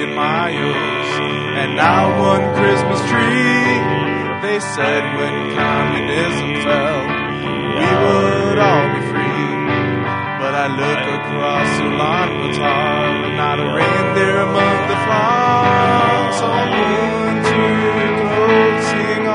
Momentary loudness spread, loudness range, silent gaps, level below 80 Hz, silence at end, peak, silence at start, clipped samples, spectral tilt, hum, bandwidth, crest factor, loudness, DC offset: 6 LU; 3 LU; none; -48 dBFS; 0 s; 0 dBFS; 0 s; under 0.1%; -5.5 dB/octave; none; 10 kHz; 16 dB; -15 LUFS; under 0.1%